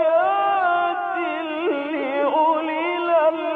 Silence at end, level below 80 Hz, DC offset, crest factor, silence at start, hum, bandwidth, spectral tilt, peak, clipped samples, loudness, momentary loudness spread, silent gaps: 0 s; -74 dBFS; under 0.1%; 12 dB; 0 s; none; 4.5 kHz; -5.5 dB/octave; -8 dBFS; under 0.1%; -21 LUFS; 6 LU; none